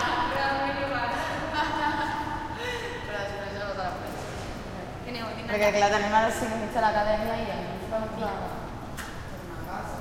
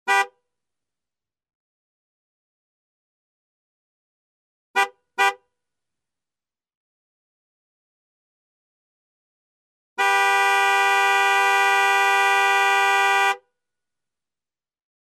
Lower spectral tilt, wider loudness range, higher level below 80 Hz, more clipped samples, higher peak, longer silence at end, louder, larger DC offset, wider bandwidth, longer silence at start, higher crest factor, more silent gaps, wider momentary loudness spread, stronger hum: first, -4.5 dB/octave vs 2.5 dB/octave; second, 6 LU vs 13 LU; first, -44 dBFS vs under -90 dBFS; neither; about the same, -8 dBFS vs -6 dBFS; second, 0 s vs 1.65 s; second, -29 LUFS vs -18 LUFS; neither; about the same, 16.5 kHz vs 17 kHz; about the same, 0 s vs 0.05 s; about the same, 20 dB vs 18 dB; second, none vs 1.55-4.74 s, 6.75-9.96 s; first, 14 LU vs 6 LU; neither